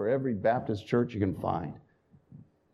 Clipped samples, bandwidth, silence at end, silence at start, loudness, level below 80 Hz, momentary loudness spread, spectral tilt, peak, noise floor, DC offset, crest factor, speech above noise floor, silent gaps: under 0.1%; 12 kHz; 0.3 s; 0 s; -30 LUFS; -62 dBFS; 9 LU; -8.5 dB/octave; -12 dBFS; -57 dBFS; under 0.1%; 18 dB; 27 dB; none